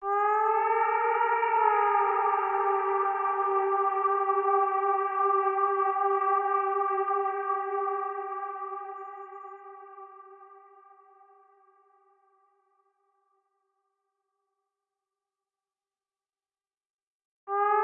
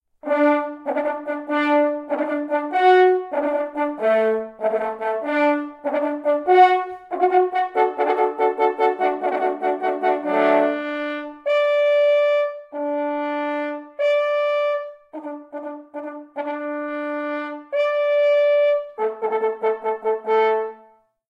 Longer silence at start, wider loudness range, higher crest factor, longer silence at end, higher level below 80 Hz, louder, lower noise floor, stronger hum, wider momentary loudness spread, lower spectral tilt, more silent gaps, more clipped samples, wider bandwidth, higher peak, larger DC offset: second, 0 s vs 0.25 s; first, 16 LU vs 6 LU; about the same, 18 dB vs 18 dB; second, 0 s vs 0.55 s; second, -86 dBFS vs -72 dBFS; second, -27 LUFS vs -21 LUFS; first, under -90 dBFS vs -54 dBFS; neither; first, 16 LU vs 11 LU; second, 0.5 dB/octave vs -5 dB/octave; first, 16.90-16.94 s, 17.03-17.47 s vs none; neither; second, 3.3 kHz vs 7.4 kHz; second, -12 dBFS vs -4 dBFS; neither